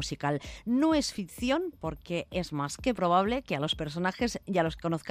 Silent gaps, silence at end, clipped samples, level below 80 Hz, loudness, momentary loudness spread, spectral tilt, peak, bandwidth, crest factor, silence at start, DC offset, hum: none; 0 s; under 0.1%; -50 dBFS; -30 LUFS; 8 LU; -5 dB/octave; -12 dBFS; 15 kHz; 18 dB; 0 s; under 0.1%; none